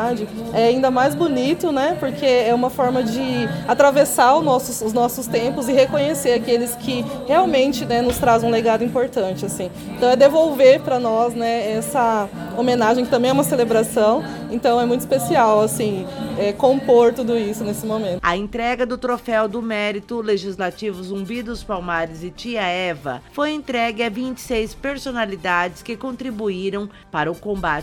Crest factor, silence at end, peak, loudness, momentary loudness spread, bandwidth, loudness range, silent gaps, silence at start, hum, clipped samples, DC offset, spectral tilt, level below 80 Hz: 18 dB; 0 s; -2 dBFS; -19 LUFS; 12 LU; 18 kHz; 7 LU; none; 0 s; none; under 0.1%; under 0.1%; -4.5 dB/octave; -46 dBFS